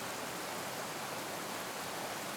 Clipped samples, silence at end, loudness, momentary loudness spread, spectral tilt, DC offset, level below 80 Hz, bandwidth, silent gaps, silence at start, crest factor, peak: under 0.1%; 0 s; -40 LUFS; 0 LU; -2 dB/octave; under 0.1%; -74 dBFS; over 20 kHz; none; 0 s; 14 dB; -28 dBFS